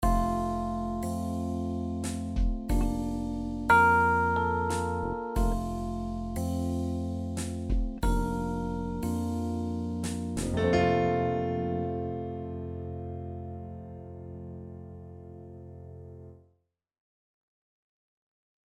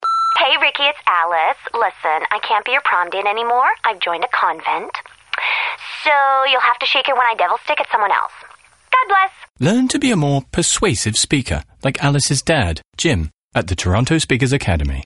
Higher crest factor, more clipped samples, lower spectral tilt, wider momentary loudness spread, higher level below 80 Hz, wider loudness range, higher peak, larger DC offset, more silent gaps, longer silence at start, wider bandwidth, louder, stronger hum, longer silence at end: about the same, 20 dB vs 16 dB; neither; first, -6.5 dB/octave vs -3.5 dB/octave; first, 19 LU vs 8 LU; about the same, -38 dBFS vs -36 dBFS; first, 18 LU vs 2 LU; second, -10 dBFS vs -2 dBFS; neither; second, none vs 9.50-9.54 s, 13.43-13.49 s; about the same, 0 s vs 0 s; first, 15.5 kHz vs 11.5 kHz; second, -30 LUFS vs -16 LUFS; neither; first, 2.35 s vs 0 s